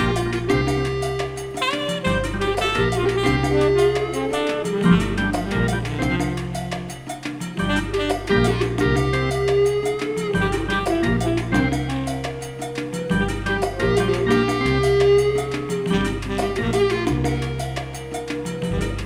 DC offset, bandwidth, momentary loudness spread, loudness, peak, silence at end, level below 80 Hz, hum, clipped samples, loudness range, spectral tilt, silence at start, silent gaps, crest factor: under 0.1%; 15 kHz; 10 LU; -21 LUFS; -4 dBFS; 0 s; -34 dBFS; none; under 0.1%; 3 LU; -6 dB/octave; 0 s; none; 16 dB